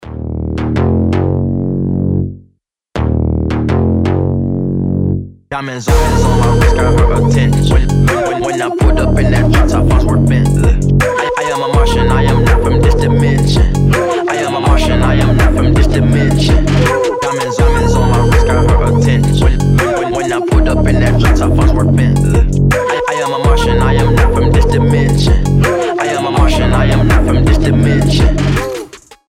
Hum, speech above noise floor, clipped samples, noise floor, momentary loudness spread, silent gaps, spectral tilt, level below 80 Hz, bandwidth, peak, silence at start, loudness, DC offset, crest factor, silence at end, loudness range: none; 46 dB; under 0.1%; -55 dBFS; 5 LU; none; -6.5 dB/octave; -16 dBFS; 14.5 kHz; 0 dBFS; 0 s; -12 LUFS; under 0.1%; 10 dB; 0.35 s; 4 LU